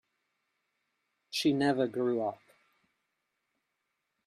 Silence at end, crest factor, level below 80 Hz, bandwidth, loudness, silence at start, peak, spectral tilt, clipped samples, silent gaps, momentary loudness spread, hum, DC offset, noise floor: 1.9 s; 20 dB; -76 dBFS; 14 kHz; -31 LUFS; 1.3 s; -16 dBFS; -5 dB/octave; under 0.1%; none; 9 LU; none; under 0.1%; -83 dBFS